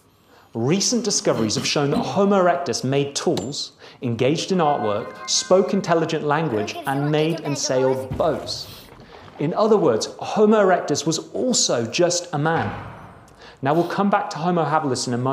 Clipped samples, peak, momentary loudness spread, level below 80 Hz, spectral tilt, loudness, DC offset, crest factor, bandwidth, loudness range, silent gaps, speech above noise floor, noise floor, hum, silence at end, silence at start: under 0.1%; -4 dBFS; 10 LU; -54 dBFS; -4.5 dB/octave; -21 LUFS; under 0.1%; 16 dB; 15.5 kHz; 3 LU; none; 32 dB; -53 dBFS; none; 0 s; 0.55 s